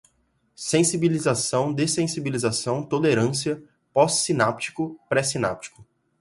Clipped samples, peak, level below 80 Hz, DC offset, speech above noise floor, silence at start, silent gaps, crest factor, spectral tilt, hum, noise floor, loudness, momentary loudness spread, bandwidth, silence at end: under 0.1%; -4 dBFS; -60 dBFS; under 0.1%; 45 dB; 0.6 s; none; 20 dB; -4 dB/octave; none; -68 dBFS; -23 LUFS; 9 LU; 11.5 kHz; 0.4 s